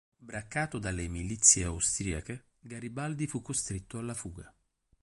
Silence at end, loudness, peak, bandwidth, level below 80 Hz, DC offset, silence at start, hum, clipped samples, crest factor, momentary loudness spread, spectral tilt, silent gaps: 0.55 s; -30 LUFS; -6 dBFS; 11.5 kHz; -48 dBFS; under 0.1%; 0.2 s; none; under 0.1%; 26 dB; 22 LU; -3 dB/octave; none